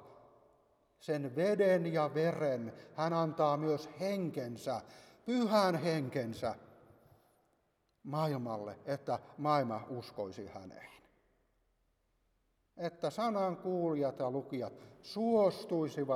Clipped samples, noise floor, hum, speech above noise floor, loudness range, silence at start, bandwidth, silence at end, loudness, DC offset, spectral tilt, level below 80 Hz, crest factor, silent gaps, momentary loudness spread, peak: under 0.1%; -78 dBFS; none; 43 dB; 8 LU; 0 s; 15.5 kHz; 0 s; -35 LUFS; under 0.1%; -7 dB/octave; -76 dBFS; 20 dB; none; 15 LU; -16 dBFS